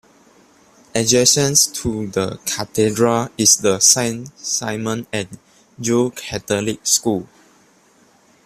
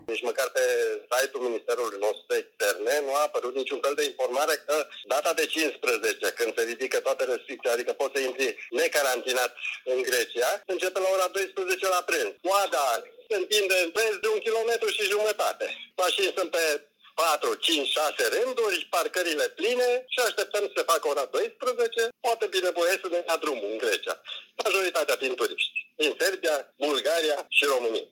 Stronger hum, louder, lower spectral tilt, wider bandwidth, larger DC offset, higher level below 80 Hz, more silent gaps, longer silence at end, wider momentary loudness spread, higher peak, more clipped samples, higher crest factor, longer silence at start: neither; first, -17 LUFS vs -26 LUFS; first, -2.5 dB/octave vs 0.5 dB/octave; second, 16 kHz vs 18 kHz; neither; first, -52 dBFS vs -82 dBFS; neither; first, 1.2 s vs 0.05 s; first, 13 LU vs 5 LU; first, 0 dBFS vs -8 dBFS; neither; about the same, 20 dB vs 18 dB; first, 0.95 s vs 0.1 s